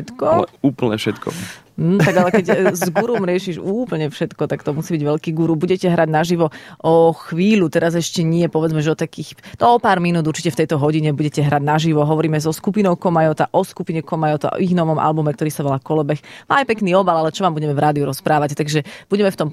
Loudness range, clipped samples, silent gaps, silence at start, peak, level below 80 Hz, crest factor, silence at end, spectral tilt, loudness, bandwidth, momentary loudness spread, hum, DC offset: 2 LU; under 0.1%; none; 0 s; -2 dBFS; -56 dBFS; 16 dB; 0 s; -6.5 dB/octave; -17 LUFS; 14.5 kHz; 8 LU; none; under 0.1%